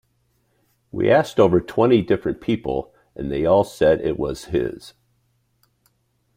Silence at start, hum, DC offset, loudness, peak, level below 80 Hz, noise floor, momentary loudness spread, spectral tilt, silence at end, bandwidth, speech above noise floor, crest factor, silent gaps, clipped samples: 0.95 s; none; under 0.1%; -20 LUFS; -2 dBFS; -46 dBFS; -66 dBFS; 12 LU; -7 dB/octave; 1.45 s; 15.5 kHz; 47 dB; 18 dB; none; under 0.1%